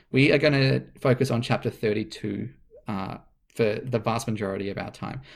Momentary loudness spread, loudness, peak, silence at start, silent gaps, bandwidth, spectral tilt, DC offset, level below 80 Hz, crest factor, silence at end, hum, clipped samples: 16 LU; -26 LUFS; -6 dBFS; 0.1 s; none; 14.5 kHz; -6.5 dB/octave; under 0.1%; -54 dBFS; 20 dB; 0 s; none; under 0.1%